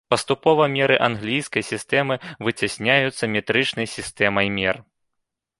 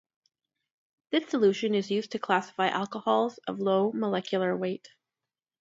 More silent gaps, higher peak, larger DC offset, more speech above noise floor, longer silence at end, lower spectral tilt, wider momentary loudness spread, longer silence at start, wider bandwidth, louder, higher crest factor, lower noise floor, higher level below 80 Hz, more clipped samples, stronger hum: neither; first, -2 dBFS vs -8 dBFS; neither; second, 58 dB vs over 62 dB; about the same, 0.8 s vs 0.75 s; about the same, -4.5 dB/octave vs -5.5 dB/octave; about the same, 8 LU vs 7 LU; second, 0.1 s vs 1.1 s; first, 11.5 kHz vs 7.8 kHz; first, -21 LUFS vs -28 LUFS; about the same, 20 dB vs 20 dB; second, -79 dBFS vs under -90 dBFS; first, -56 dBFS vs -76 dBFS; neither; neither